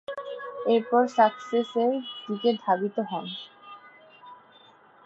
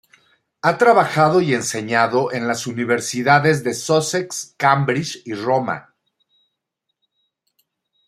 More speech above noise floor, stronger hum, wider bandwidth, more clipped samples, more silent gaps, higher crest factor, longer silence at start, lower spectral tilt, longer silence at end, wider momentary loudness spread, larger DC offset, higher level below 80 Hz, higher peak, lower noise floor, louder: second, 30 dB vs 60 dB; neither; second, 7.8 kHz vs 15 kHz; neither; neither; about the same, 20 dB vs 18 dB; second, 0.1 s vs 0.65 s; first, -6 dB/octave vs -4.5 dB/octave; second, 0.7 s vs 2.25 s; first, 18 LU vs 9 LU; neither; second, -80 dBFS vs -64 dBFS; second, -8 dBFS vs 0 dBFS; second, -55 dBFS vs -77 dBFS; second, -26 LUFS vs -18 LUFS